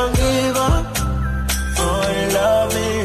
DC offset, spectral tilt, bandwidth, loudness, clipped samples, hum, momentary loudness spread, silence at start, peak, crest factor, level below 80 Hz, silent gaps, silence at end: under 0.1%; -4.5 dB/octave; 15 kHz; -18 LUFS; under 0.1%; none; 5 LU; 0 s; -4 dBFS; 14 dB; -24 dBFS; none; 0 s